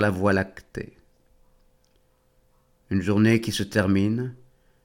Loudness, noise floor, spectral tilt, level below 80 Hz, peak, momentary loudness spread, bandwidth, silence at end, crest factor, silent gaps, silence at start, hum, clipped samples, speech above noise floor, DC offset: -24 LUFS; -64 dBFS; -6.5 dB/octave; -54 dBFS; -6 dBFS; 17 LU; 17 kHz; 0.5 s; 20 dB; none; 0 s; none; under 0.1%; 41 dB; under 0.1%